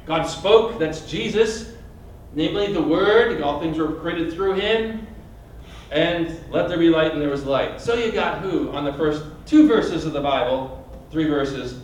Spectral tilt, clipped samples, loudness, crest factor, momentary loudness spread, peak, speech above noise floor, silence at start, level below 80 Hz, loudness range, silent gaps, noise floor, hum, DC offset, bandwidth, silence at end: -5.5 dB/octave; under 0.1%; -21 LUFS; 18 dB; 11 LU; -2 dBFS; 20 dB; 0.05 s; -42 dBFS; 2 LU; none; -41 dBFS; none; under 0.1%; 10.5 kHz; 0 s